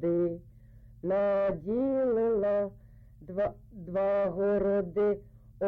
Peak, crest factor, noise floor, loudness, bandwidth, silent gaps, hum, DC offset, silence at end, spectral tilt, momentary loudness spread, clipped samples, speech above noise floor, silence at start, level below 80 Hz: -20 dBFS; 10 dB; -53 dBFS; -30 LUFS; 4.6 kHz; none; none; under 0.1%; 0 s; -10.5 dB/octave; 10 LU; under 0.1%; 24 dB; 0 s; -54 dBFS